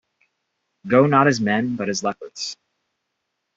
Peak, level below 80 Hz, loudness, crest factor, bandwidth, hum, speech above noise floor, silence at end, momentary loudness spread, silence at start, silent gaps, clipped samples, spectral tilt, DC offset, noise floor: 0 dBFS; -62 dBFS; -20 LUFS; 22 dB; 8 kHz; none; 58 dB; 1.05 s; 14 LU; 0.85 s; none; under 0.1%; -5 dB/octave; under 0.1%; -77 dBFS